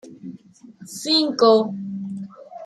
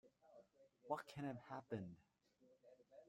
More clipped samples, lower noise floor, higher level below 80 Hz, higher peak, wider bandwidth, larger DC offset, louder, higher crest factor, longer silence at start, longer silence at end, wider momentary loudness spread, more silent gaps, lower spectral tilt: neither; second, -45 dBFS vs -76 dBFS; first, -72 dBFS vs -86 dBFS; first, -4 dBFS vs -30 dBFS; about the same, 14 kHz vs 14 kHz; neither; first, -19 LUFS vs -51 LUFS; second, 18 dB vs 24 dB; about the same, 0.05 s vs 0.05 s; about the same, 0 s vs 0 s; first, 23 LU vs 20 LU; neither; second, -4.5 dB/octave vs -7 dB/octave